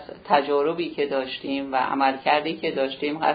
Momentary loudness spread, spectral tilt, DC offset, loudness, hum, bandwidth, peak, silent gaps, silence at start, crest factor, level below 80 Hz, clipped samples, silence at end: 6 LU; -8 dB/octave; under 0.1%; -24 LUFS; none; 5 kHz; -6 dBFS; none; 0 s; 18 dB; -64 dBFS; under 0.1%; 0 s